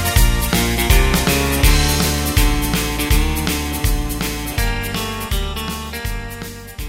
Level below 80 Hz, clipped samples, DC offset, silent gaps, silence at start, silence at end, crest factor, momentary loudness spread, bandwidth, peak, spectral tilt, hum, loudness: -20 dBFS; under 0.1%; under 0.1%; none; 0 s; 0 s; 18 dB; 11 LU; 16.5 kHz; 0 dBFS; -4 dB/octave; none; -18 LUFS